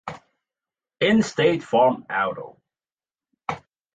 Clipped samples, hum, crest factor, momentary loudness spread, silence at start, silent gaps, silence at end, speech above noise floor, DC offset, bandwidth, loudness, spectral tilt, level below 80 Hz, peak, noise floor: under 0.1%; none; 18 dB; 18 LU; 0.05 s; none; 0.35 s; over 70 dB; under 0.1%; 9 kHz; -22 LUFS; -5.5 dB/octave; -62 dBFS; -6 dBFS; under -90 dBFS